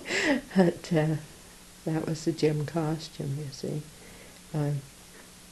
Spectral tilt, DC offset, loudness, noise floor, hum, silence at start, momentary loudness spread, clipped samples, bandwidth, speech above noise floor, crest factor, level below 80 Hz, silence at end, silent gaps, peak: -6 dB/octave; under 0.1%; -30 LUFS; -50 dBFS; none; 0 s; 23 LU; under 0.1%; 12.5 kHz; 22 dB; 24 dB; -58 dBFS; 0 s; none; -6 dBFS